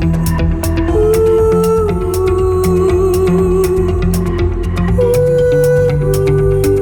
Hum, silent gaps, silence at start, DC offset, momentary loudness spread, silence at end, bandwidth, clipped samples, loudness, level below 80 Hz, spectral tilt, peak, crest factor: none; none; 0 s; under 0.1%; 4 LU; 0 s; 19 kHz; under 0.1%; -13 LUFS; -20 dBFS; -7.5 dB/octave; -2 dBFS; 10 dB